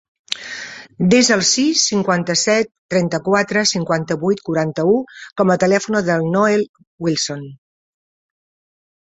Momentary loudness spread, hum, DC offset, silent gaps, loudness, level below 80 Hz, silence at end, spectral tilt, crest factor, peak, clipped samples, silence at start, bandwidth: 13 LU; none; under 0.1%; 2.78-2.89 s, 6.69-6.74 s, 6.87-6.98 s; -17 LUFS; -58 dBFS; 1.45 s; -4 dB/octave; 18 dB; 0 dBFS; under 0.1%; 0.3 s; 8.2 kHz